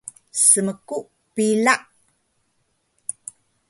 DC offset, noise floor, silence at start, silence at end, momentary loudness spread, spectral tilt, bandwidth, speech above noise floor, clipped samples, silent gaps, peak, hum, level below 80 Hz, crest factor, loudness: under 0.1%; -69 dBFS; 0.35 s; 1.9 s; 19 LU; -2.5 dB/octave; 12 kHz; 50 dB; under 0.1%; none; 0 dBFS; none; -70 dBFS; 24 dB; -18 LUFS